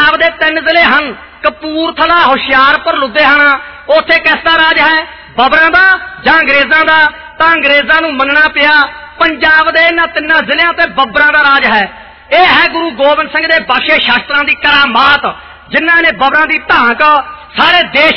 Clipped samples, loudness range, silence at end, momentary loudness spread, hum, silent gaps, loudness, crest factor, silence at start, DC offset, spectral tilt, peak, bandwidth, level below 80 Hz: under 0.1%; 1 LU; 0 s; 6 LU; none; none; -7 LUFS; 8 dB; 0 s; 0.7%; -4.5 dB/octave; 0 dBFS; 6.2 kHz; -40 dBFS